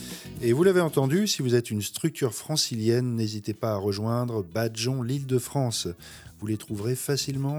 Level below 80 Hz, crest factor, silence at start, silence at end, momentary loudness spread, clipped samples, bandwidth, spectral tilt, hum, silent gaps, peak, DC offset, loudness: -60 dBFS; 18 dB; 0 s; 0 s; 9 LU; under 0.1%; over 20 kHz; -5 dB/octave; none; none; -8 dBFS; under 0.1%; -26 LUFS